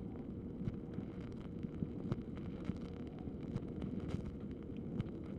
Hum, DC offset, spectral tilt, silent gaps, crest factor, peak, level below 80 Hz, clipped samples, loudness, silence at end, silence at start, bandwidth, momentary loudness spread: none; under 0.1%; -9.5 dB/octave; none; 18 dB; -26 dBFS; -54 dBFS; under 0.1%; -45 LUFS; 0 s; 0 s; 9.6 kHz; 4 LU